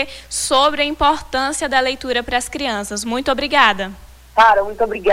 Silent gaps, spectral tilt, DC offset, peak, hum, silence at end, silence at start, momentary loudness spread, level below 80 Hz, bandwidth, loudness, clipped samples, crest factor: none; -2 dB/octave; under 0.1%; 0 dBFS; none; 0 s; 0 s; 9 LU; -40 dBFS; 18 kHz; -17 LUFS; under 0.1%; 16 dB